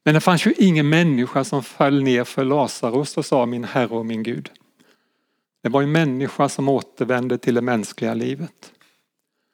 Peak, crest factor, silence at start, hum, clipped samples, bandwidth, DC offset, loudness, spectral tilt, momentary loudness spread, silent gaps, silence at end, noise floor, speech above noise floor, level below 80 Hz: 0 dBFS; 20 dB; 0.05 s; none; under 0.1%; 18 kHz; under 0.1%; -20 LUFS; -6 dB/octave; 9 LU; none; 0.85 s; -75 dBFS; 55 dB; -74 dBFS